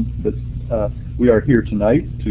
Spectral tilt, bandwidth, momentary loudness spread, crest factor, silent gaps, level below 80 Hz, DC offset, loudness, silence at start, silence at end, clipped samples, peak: -12.5 dB/octave; 4 kHz; 9 LU; 16 dB; none; -28 dBFS; under 0.1%; -18 LUFS; 0 s; 0 s; under 0.1%; 0 dBFS